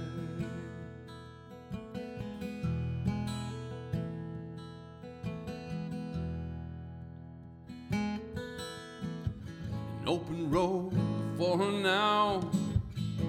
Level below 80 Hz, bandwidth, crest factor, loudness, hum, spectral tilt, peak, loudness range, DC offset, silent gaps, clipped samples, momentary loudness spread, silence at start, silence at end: -52 dBFS; 15 kHz; 18 dB; -35 LUFS; none; -6.5 dB/octave; -16 dBFS; 10 LU; under 0.1%; none; under 0.1%; 18 LU; 0 s; 0 s